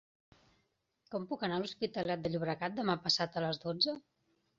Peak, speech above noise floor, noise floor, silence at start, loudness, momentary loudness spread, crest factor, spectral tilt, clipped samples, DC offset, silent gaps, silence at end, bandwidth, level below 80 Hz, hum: -16 dBFS; 43 dB; -79 dBFS; 1.1 s; -35 LUFS; 9 LU; 22 dB; -3 dB/octave; under 0.1%; under 0.1%; none; 0.6 s; 7.4 kHz; -72 dBFS; none